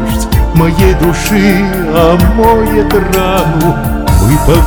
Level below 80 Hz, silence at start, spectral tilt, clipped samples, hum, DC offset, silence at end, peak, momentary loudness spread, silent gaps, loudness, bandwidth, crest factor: -16 dBFS; 0 s; -6 dB/octave; 2%; none; under 0.1%; 0 s; 0 dBFS; 4 LU; none; -9 LUFS; over 20 kHz; 8 dB